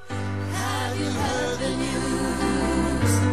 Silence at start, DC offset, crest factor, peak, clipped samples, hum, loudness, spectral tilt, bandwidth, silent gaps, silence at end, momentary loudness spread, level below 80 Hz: 0 s; 1%; 14 dB; -10 dBFS; under 0.1%; none; -25 LUFS; -5 dB/octave; 13.5 kHz; none; 0 s; 5 LU; -38 dBFS